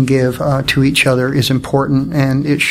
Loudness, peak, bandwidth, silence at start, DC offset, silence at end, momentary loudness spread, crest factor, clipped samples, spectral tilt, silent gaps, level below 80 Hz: -14 LUFS; 0 dBFS; 16 kHz; 0 s; under 0.1%; 0 s; 4 LU; 12 dB; under 0.1%; -5.5 dB/octave; none; -38 dBFS